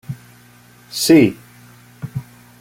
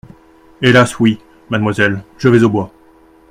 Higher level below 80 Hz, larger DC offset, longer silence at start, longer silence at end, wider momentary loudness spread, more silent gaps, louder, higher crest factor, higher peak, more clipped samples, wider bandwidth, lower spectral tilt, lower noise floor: second, -54 dBFS vs -46 dBFS; neither; second, 0.1 s vs 0.6 s; second, 0.4 s vs 0.65 s; first, 23 LU vs 11 LU; neither; about the same, -14 LUFS vs -13 LUFS; about the same, 18 dB vs 14 dB; about the same, -2 dBFS vs 0 dBFS; neither; first, 16.5 kHz vs 14.5 kHz; about the same, -5 dB/octave vs -6 dB/octave; about the same, -47 dBFS vs -46 dBFS